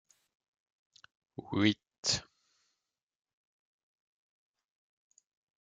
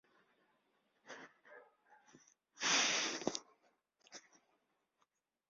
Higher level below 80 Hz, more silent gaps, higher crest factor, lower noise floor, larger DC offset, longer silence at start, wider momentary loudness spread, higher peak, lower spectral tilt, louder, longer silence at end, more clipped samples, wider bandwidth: first, -72 dBFS vs under -90 dBFS; first, 1.98-2.03 s vs none; about the same, 28 dB vs 26 dB; first, -88 dBFS vs -83 dBFS; neither; first, 1.4 s vs 1.05 s; second, 19 LU vs 26 LU; first, -14 dBFS vs -18 dBFS; first, -3.5 dB/octave vs 0.5 dB/octave; first, -32 LUFS vs -35 LUFS; first, 3.4 s vs 1.3 s; neither; first, 9.6 kHz vs 7.4 kHz